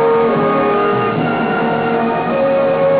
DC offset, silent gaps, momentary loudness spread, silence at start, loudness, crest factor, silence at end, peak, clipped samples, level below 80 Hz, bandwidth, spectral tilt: under 0.1%; none; 3 LU; 0 s; -15 LUFS; 10 dB; 0 s; -4 dBFS; under 0.1%; -48 dBFS; 4 kHz; -10.5 dB/octave